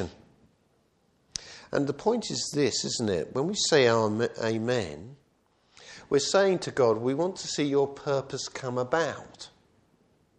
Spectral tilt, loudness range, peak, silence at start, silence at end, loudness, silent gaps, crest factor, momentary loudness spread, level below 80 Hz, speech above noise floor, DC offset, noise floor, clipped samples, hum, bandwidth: -4 dB/octave; 4 LU; -8 dBFS; 0 s; 0.9 s; -27 LUFS; none; 20 dB; 16 LU; -64 dBFS; 41 dB; under 0.1%; -68 dBFS; under 0.1%; none; 11 kHz